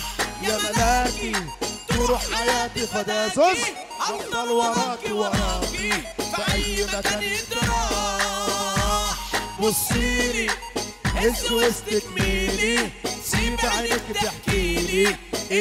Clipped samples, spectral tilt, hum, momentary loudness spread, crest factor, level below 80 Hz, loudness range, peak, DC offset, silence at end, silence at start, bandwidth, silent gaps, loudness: under 0.1%; -3 dB/octave; none; 6 LU; 16 dB; -34 dBFS; 1 LU; -8 dBFS; under 0.1%; 0 s; 0 s; 16 kHz; none; -23 LUFS